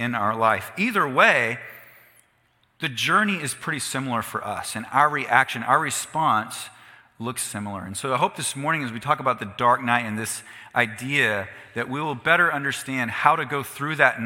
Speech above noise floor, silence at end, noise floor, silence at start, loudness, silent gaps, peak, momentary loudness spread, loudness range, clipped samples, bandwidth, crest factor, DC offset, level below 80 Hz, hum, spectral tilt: 41 dB; 0 s; -65 dBFS; 0 s; -23 LUFS; none; -2 dBFS; 12 LU; 4 LU; under 0.1%; 17 kHz; 22 dB; under 0.1%; -66 dBFS; none; -3.5 dB/octave